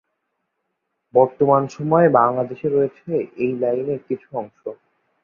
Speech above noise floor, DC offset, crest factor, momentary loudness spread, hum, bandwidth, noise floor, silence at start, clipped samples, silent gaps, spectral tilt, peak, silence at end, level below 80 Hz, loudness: 56 dB; under 0.1%; 18 dB; 15 LU; none; 7.2 kHz; -76 dBFS; 1.15 s; under 0.1%; none; -9 dB/octave; -2 dBFS; 0.5 s; -64 dBFS; -19 LUFS